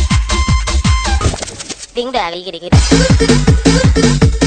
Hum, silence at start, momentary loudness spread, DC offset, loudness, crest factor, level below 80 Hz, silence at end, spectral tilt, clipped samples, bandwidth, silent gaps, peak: none; 0 s; 12 LU; under 0.1%; -12 LUFS; 12 dB; -16 dBFS; 0 s; -5 dB/octave; 0.4%; 9.4 kHz; none; 0 dBFS